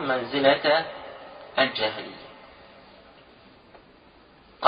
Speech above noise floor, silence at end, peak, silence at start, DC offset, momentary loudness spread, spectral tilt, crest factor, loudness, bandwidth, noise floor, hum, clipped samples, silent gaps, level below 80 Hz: 30 dB; 0 s; -2 dBFS; 0 s; under 0.1%; 23 LU; -8 dB/octave; 26 dB; -24 LUFS; 5.2 kHz; -54 dBFS; none; under 0.1%; none; -64 dBFS